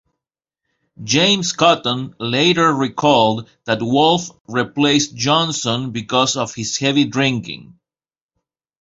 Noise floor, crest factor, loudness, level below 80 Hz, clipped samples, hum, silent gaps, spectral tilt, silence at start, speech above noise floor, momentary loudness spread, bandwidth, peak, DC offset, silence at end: under -90 dBFS; 18 dB; -17 LUFS; -56 dBFS; under 0.1%; none; 4.40-4.45 s; -4 dB/octave; 1 s; over 73 dB; 9 LU; 8 kHz; -2 dBFS; under 0.1%; 1.15 s